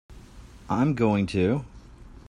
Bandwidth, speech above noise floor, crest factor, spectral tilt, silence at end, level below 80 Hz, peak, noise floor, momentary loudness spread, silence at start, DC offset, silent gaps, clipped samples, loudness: 11 kHz; 23 dB; 16 dB; -8 dB/octave; 0.1 s; -48 dBFS; -10 dBFS; -47 dBFS; 8 LU; 0.1 s; under 0.1%; none; under 0.1%; -25 LUFS